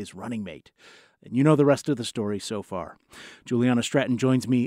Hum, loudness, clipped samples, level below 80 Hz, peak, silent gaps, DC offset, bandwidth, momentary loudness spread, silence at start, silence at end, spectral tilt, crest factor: none; -25 LUFS; under 0.1%; -66 dBFS; -8 dBFS; none; under 0.1%; 15 kHz; 21 LU; 0 s; 0 s; -6 dB/octave; 18 dB